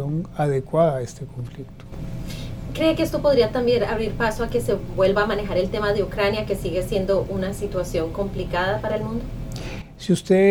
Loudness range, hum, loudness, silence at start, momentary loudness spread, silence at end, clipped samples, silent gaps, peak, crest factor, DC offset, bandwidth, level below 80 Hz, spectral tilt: 4 LU; none; -23 LUFS; 0 s; 14 LU; 0 s; under 0.1%; none; -6 dBFS; 16 dB; under 0.1%; 18 kHz; -36 dBFS; -6 dB/octave